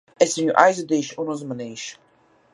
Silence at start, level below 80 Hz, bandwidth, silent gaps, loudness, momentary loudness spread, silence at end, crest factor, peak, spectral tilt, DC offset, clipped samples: 0.2 s; -72 dBFS; 11.5 kHz; none; -21 LUFS; 16 LU; 0.6 s; 22 dB; 0 dBFS; -4 dB/octave; under 0.1%; under 0.1%